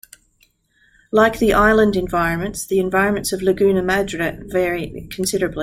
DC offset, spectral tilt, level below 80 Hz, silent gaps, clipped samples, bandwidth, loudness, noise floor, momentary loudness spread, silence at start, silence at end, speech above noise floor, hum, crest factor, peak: under 0.1%; -5 dB/octave; -38 dBFS; none; under 0.1%; 16.5 kHz; -18 LUFS; -60 dBFS; 9 LU; 1.15 s; 0 s; 42 dB; none; 16 dB; -2 dBFS